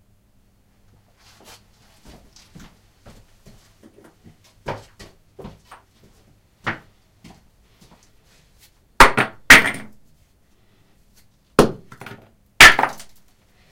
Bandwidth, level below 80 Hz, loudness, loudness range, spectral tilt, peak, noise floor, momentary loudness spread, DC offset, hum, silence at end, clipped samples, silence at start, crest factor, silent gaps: 17 kHz; -38 dBFS; -13 LUFS; 21 LU; -2 dB/octave; 0 dBFS; -58 dBFS; 28 LU; under 0.1%; none; 0.8 s; 0.2%; 4.65 s; 22 dB; none